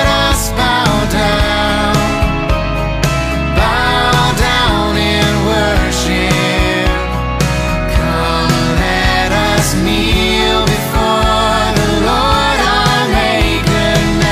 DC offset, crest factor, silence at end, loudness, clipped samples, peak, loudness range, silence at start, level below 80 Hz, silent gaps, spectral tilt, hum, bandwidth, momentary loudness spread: under 0.1%; 12 dB; 0 s; -12 LUFS; under 0.1%; 0 dBFS; 2 LU; 0 s; -20 dBFS; none; -4.5 dB/octave; none; 16 kHz; 4 LU